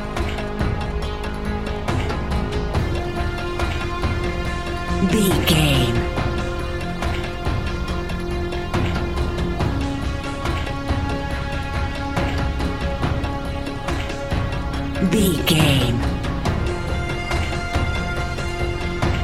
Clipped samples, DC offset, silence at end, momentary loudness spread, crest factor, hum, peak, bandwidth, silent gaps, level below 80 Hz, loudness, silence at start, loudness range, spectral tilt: under 0.1%; under 0.1%; 0 s; 8 LU; 20 dB; none; -2 dBFS; 16 kHz; none; -28 dBFS; -23 LUFS; 0 s; 4 LU; -5.5 dB/octave